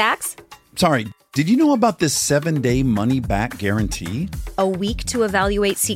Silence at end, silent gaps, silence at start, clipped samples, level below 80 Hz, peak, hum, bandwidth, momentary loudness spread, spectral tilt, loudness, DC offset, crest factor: 0 s; none; 0 s; under 0.1%; -36 dBFS; -4 dBFS; none; 16.5 kHz; 10 LU; -4.5 dB/octave; -20 LUFS; under 0.1%; 16 dB